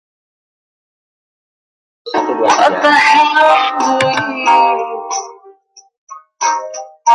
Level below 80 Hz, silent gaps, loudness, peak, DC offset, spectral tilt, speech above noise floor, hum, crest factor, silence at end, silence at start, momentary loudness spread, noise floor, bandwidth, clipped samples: -64 dBFS; 5.97-6.07 s; -12 LUFS; 0 dBFS; under 0.1%; -2 dB/octave; 34 dB; none; 14 dB; 0 s; 2.05 s; 13 LU; -45 dBFS; 11 kHz; under 0.1%